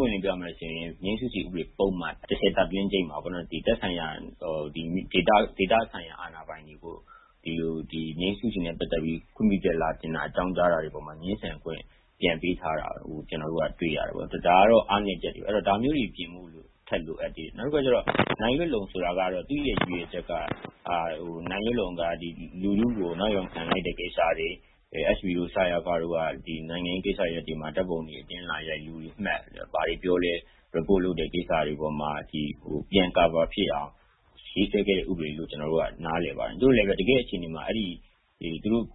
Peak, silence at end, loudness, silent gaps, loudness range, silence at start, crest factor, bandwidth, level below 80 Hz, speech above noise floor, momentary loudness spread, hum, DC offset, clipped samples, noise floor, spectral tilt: -6 dBFS; 0 s; -28 LUFS; none; 5 LU; 0 s; 22 dB; 4.1 kHz; -46 dBFS; 25 dB; 12 LU; none; under 0.1%; under 0.1%; -53 dBFS; -10 dB/octave